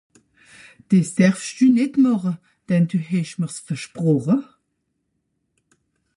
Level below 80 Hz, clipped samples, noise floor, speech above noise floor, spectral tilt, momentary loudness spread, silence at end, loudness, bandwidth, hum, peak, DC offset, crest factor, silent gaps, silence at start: -66 dBFS; under 0.1%; -74 dBFS; 55 dB; -7 dB/octave; 11 LU; 1.75 s; -20 LUFS; 11.5 kHz; none; -4 dBFS; under 0.1%; 18 dB; none; 0.9 s